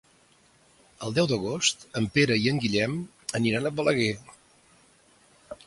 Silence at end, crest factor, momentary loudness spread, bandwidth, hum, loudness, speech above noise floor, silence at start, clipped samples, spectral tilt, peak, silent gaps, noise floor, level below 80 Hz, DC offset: 0.1 s; 20 dB; 11 LU; 11.5 kHz; none; -26 LUFS; 35 dB; 1 s; under 0.1%; -4.5 dB/octave; -8 dBFS; none; -61 dBFS; -60 dBFS; under 0.1%